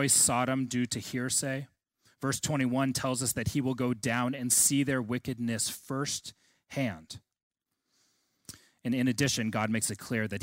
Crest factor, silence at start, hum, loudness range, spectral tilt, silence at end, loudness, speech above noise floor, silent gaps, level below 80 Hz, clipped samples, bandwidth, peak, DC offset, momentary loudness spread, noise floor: 18 dB; 0 s; none; 8 LU; -3.5 dB/octave; 0 s; -29 LUFS; 47 dB; 7.43-7.51 s; -60 dBFS; under 0.1%; 16 kHz; -12 dBFS; under 0.1%; 16 LU; -77 dBFS